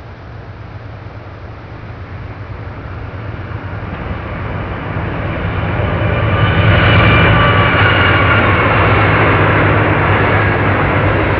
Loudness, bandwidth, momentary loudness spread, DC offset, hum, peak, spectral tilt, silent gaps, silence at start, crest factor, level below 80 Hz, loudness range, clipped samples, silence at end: -12 LUFS; 5.4 kHz; 21 LU; 0.3%; none; -2 dBFS; -9 dB/octave; none; 0 s; 12 dB; -26 dBFS; 17 LU; under 0.1%; 0 s